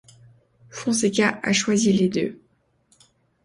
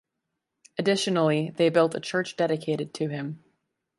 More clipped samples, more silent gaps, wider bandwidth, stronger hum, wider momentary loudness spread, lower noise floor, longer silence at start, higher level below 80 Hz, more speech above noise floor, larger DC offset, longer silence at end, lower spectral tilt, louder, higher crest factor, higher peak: neither; neither; about the same, 11.5 kHz vs 11.5 kHz; neither; about the same, 11 LU vs 12 LU; second, -63 dBFS vs -82 dBFS; about the same, 0.75 s vs 0.8 s; first, -62 dBFS vs -74 dBFS; second, 42 dB vs 57 dB; neither; first, 1.1 s vs 0.6 s; second, -4 dB/octave vs -5.5 dB/octave; first, -21 LUFS vs -26 LUFS; about the same, 18 dB vs 18 dB; about the same, -6 dBFS vs -8 dBFS